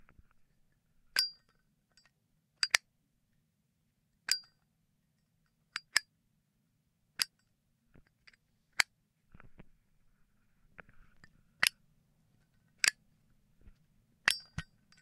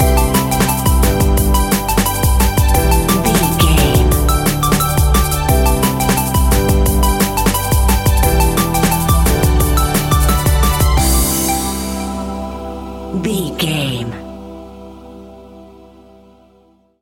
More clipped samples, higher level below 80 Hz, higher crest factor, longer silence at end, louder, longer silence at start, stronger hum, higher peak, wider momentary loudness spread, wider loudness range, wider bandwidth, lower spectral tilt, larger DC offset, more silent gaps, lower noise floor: neither; second, -68 dBFS vs -18 dBFS; first, 36 dB vs 14 dB; second, 0.4 s vs 1.35 s; second, -33 LUFS vs -14 LUFS; first, 1.15 s vs 0 s; neither; second, -4 dBFS vs 0 dBFS; first, 15 LU vs 11 LU; second, 5 LU vs 9 LU; about the same, 15.5 kHz vs 17 kHz; second, 1 dB/octave vs -4.5 dB/octave; neither; neither; first, -78 dBFS vs -52 dBFS